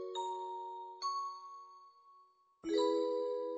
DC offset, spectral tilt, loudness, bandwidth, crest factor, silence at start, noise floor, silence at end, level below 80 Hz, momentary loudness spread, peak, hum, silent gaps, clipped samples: under 0.1%; -3 dB/octave; -38 LUFS; 8.4 kHz; 16 dB; 0 s; -67 dBFS; 0 s; -84 dBFS; 19 LU; -22 dBFS; none; none; under 0.1%